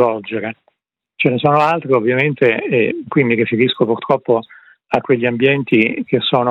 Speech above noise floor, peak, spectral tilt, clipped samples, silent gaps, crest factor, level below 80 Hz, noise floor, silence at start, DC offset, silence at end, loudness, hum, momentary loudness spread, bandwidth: 55 dB; 0 dBFS; -8 dB/octave; under 0.1%; none; 16 dB; -62 dBFS; -70 dBFS; 0 s; under 0.1%; 0 s; -16 LUFS; none; 6 LU; 7.6 kHz